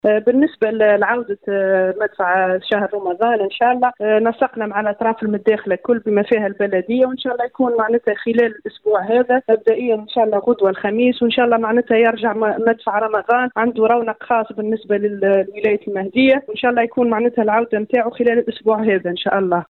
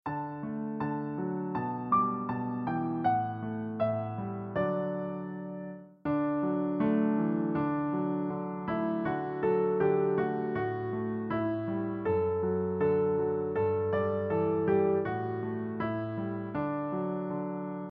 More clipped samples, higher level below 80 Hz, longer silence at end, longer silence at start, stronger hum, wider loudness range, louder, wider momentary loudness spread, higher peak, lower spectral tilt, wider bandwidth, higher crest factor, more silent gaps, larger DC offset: neither; about the same, -60 dBFS vs -64 dBFS; about the same, 0.1 s vs 0 s; about the same, 0.05 s vs 0.05 s; neither; about the same, 2 LU vs 3 LU; first, -17 LUFS vs -31 LUFS; second, 5 LU vs 9 LU; first, -4 dBFS vs -16 dBFS; about the same, -8.5 dB/octave vs -8 dB/octave; second, 4.3 kHz vs 4.8 kHz; about the same, 12 dB vs 16 dB; neither; neither